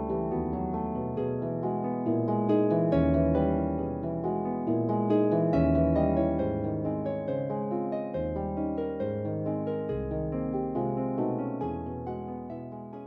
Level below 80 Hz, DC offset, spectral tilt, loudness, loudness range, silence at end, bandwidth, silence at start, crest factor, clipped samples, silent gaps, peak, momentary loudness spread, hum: -44 dBFS; under 0.1%; -11.5 dB/octave; -29 LUFS; 5 LU; 0 s; 5 kHz; 0 s; 14 dB; under 0.1%; none; -14 dBFS; 8 LU; none